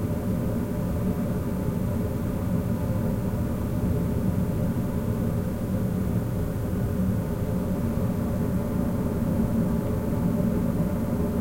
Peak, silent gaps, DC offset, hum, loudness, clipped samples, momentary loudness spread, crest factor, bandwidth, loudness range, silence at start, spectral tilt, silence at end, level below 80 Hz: -12 dBFS; none; under 0.1%; none; -27 LUFS; under 0.1%; 3 LU; 14 dB; 16.5 kHz; 1 LU; 0 s; -8.5 dB/octave; 0 s; -36 dBFS